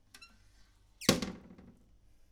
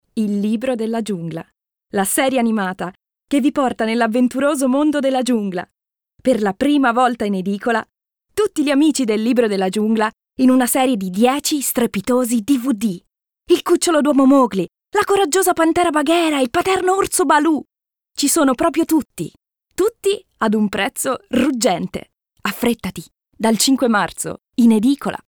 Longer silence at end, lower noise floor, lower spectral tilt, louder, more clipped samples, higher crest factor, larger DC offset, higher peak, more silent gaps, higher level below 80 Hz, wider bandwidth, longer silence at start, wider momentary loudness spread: first, 0.75 s vs 0.1 s; first, -63 dBFS vs -59 dBFS; about the same, -3.5 dB/octave vs -4 dB/octave; second, -33 LUFS vs -17 LUFS; neither; first, 32 dB vs 16 dB; neither; second, -8 dBFS vs -2 dBFS; neither; about the same, -58 dBFS vs -54 dBFS; about the same, over 20 kHz vs over 20 kHz; about the same, 0.2 s vs 0.15 s; first, 25 LU vs 10 LU